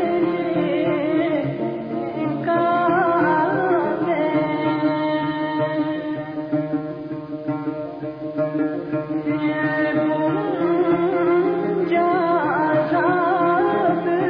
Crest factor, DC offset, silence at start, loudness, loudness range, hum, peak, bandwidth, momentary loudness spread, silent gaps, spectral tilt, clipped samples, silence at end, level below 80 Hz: 12 dB; under 0.1%; 0 s; -21 LUFS; 6 LU; none; -8 dBFS; 5.2 kHz; 8 LU; none; -10 dB/octave; under 0.1%; 0 s; -60 dBFS